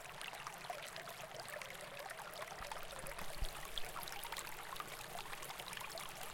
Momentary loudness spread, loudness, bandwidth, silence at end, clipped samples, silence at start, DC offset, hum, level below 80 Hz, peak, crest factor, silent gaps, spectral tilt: 3 LU; -47 LUFS; 17 kHz; 0 s; under 0.1%; 0 s; under 0.1%; none; -58 dBFS; -24 dBFS; 22 dB; none; -1.5 dB/octave